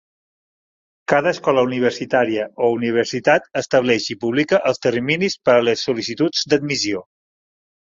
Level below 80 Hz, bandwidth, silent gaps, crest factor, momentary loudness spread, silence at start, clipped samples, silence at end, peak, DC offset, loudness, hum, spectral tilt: -60 dBFS; 7.8 kHz; none; 18 dB; 5 LU; 1.1 s; under 0.1%; 0.9 s; -2 dBFS; under 0.1%; -18 LUFS; none; -4.5 dB/octave